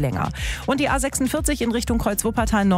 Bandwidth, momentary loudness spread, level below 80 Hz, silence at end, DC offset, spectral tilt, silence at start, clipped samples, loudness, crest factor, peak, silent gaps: 16 kHz; 5 LU; -32 dBFS; 0 s; under 0.1%; -4.5 dB/octave; 0 s; under 0.1%; -22 LUFS; 16 dB; -6 dBFS; none